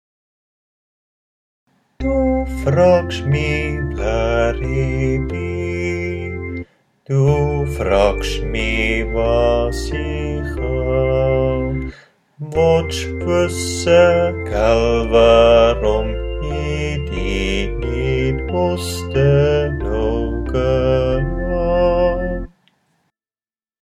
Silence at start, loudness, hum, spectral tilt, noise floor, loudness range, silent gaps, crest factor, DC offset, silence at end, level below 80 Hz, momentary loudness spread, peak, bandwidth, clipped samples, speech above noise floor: 2 s; -17 LUFS; none; -6 dB/octave; under -90 dBFS; 6 LU; none; 16 dB; under 0.1%; 1.35 s; -26 dBFS; 10 LU; 0 dBFS; 14 kHz; under 0.1%; over 74 dB